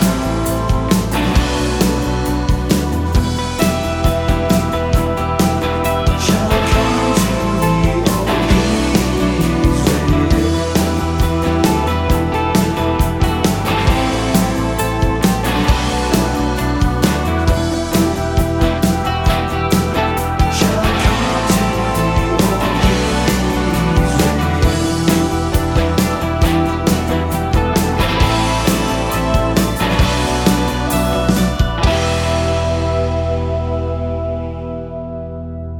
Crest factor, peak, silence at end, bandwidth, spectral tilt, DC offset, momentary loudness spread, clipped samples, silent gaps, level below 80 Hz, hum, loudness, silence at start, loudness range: 14 dB; 0 dBFS; 0 s; 19.5 kHz; -5.5 dB/octave; under 0.1%; 3 LU; under 0.1%; none; -22 dBFS; none; -16 LUFS; 0 s; 2 LU